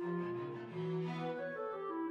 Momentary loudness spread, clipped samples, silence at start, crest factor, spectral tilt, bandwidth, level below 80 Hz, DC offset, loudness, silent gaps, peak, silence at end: 3 LU; under 0.1%; 0 s; 12 dB; -8.5 dB/octave; 7.2 kHz; -82 dBFS; under 0.1%; -41 LUFS; none; -28 dBFS; 0 s